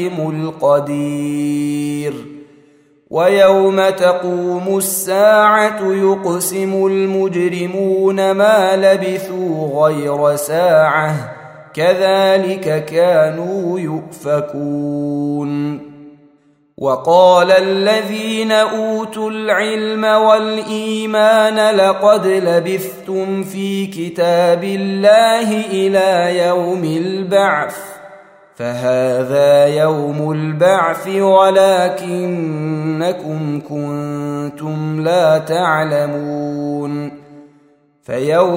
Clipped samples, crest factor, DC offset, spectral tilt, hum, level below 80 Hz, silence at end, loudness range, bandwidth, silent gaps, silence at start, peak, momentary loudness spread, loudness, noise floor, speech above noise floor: under 0.1%; 14 dB; under 0.1%; -5 dB/octave; none; -62 dBFS; 0 s; 5 LU; 16 kHz; none; 0 s; 0 dBFS; 11 LU; -14 LUFS; -53 dBFS; 39 dB